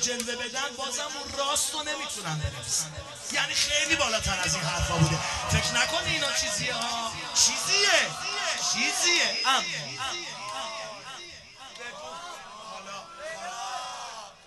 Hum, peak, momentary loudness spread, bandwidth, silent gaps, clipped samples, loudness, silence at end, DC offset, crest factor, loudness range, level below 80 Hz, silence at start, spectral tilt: none; -8 dBFS; 18 LU; 12 kHz; none; under 0.1%; -26 LUFS; 0 s; under 0.1%; 22 dB; 14 LU; -48 dBFS; 0 s; -1.5 dB/octave